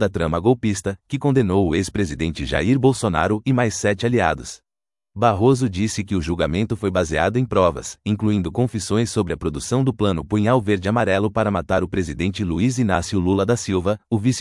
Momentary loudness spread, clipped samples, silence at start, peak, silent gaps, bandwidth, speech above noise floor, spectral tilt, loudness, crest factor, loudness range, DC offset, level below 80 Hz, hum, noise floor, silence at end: 6 LU; under 0.1%; 0 s; -2 dBFS; none; 12 kHz; over 70 dB; -6 dB/octave; -20 LUFS; 18 dB; 1 LU; under 0.1%; -42 dBFS; none; under -90 dBFS; 0 s